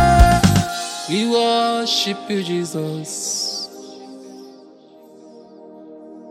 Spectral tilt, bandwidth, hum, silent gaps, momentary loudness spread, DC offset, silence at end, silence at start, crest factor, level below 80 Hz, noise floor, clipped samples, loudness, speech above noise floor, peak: -4.5 dB/octave; 16 kHz; none; none; 25 LU; under 0.1%; 0 s; 0 s; 20 dB; -28 dBFS; -45 dBFS; under 0.1%; -18 LUFS; 22 dB; 0 dBFS